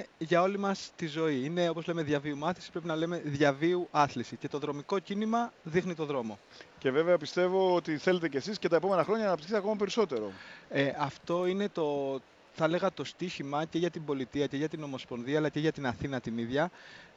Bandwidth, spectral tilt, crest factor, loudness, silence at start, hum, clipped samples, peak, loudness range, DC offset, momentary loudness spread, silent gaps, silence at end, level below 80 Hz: 8 kHz; -6 dB/octave; 20 dB; -32 LUFS; 0 s; none; under 0.1%; -12 dBFS; 4 LU; under 0.1%; 9 LU; none; 0.1 s; -66 dBFS